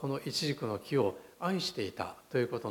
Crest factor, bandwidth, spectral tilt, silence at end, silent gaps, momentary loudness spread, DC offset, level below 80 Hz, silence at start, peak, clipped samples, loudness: 16 dB; 17.5 kHz; -5 dB/octave; 0 s; none; 6 LU; under 0.1%; -70 dBFS; 0 s; -18 dBFS; under 0.1%; -34 LUFS